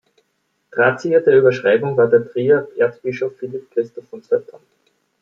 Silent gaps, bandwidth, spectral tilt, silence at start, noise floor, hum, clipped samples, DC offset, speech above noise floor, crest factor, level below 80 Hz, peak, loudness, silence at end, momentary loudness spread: none; 7 kHz; -7.5 dB/octave; 0.75 s; -69 dBFS; none; under 0.1%; under 0.1%; 52 dB; 16 dB; -66 dBFS; -2 dBFS; -17 LUFS; 0.8 s; 12 LU